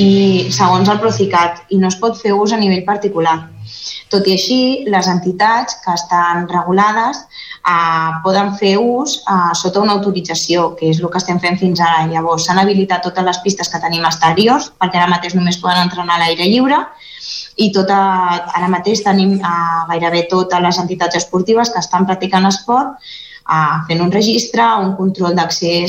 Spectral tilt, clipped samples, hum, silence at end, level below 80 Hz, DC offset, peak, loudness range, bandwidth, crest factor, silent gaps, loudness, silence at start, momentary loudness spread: -4.5 dB/octave; under 0.1%; none; 0 s; -54 dBFS; under 0.1%; -2 dBFS; 1 LU; 15.5 kHz; 12 dB; none; -13 LUFS; 0 s; 5 LU